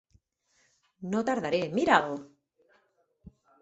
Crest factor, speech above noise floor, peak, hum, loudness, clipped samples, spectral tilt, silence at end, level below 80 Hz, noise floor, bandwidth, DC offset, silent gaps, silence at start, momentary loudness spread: 26 dB; 44 dB; -6 dBFS; none; -28 LUFS; under 0.1%; -5 dB/octave; 0.35 s; -68 dBFS; -71 dBFS; 8.2 kHz; under 0.1%; none; 1 s; 15 LU